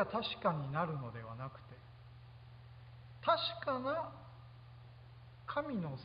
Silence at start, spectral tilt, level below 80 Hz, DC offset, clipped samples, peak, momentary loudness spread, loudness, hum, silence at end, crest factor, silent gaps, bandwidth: 0 s; -4 dB/octave; -66 dBFS; under 0.1%; under 0.1%; -18 dBFS; 22 LU; -38 LUFS; none; 0 s; 22 dB; none; 5 kHz